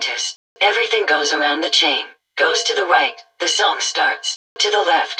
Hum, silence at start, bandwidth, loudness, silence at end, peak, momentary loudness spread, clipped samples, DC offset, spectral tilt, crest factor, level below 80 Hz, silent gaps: none; 0 s; 10.5 kHz; -17 LUFS; 0 s; -2 dBFS; 8 LU; under 0.1%; under 0.1%; 1.5 dB/octave; 16 dB; -74 dBFS; 0.36-0.56 s, 4.36-4.56 s